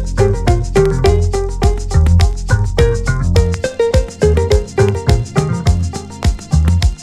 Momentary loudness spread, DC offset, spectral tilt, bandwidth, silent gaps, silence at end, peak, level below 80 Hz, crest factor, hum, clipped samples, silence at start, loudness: 5 LU; under 0.1%; -6.5 dB/octave; 12 kHz; none; 0 s; 0 dBFS; -18 dBFS; 12 dB; none; under 0.1%; 0 s; -15 LUFS